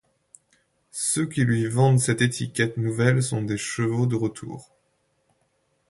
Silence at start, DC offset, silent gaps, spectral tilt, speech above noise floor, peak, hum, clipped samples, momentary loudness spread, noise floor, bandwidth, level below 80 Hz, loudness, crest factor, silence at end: 0.95 s; under 0.1%; none; -5 dB/octave; 47 dB; -4 dBFS; none; under 0.1%; 11 LU; -70 dBFS; 11.5 kHz; -58 dBFS; -23 LUFS; 22 dB; 1.25 s